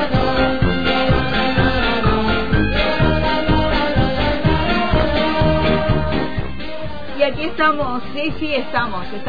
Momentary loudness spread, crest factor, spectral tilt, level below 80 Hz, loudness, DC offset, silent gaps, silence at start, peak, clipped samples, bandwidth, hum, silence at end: 7 LU; 14 dB; -8 dB/octave; -26 dBFS; -18 LUFS; 6%; none; 0 s; -4 dBFS; under 0.1%; 5 kHz; none; 0 s